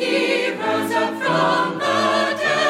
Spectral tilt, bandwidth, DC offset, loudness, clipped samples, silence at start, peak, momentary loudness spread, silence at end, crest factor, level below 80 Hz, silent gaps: -4 dB/octave; 16 kHz; under 0.1%; -19 LUFS; under 0.1%; 0 s; -6 dBFS; 3 LU; 0 s; 14 dB; -68 dBFS; none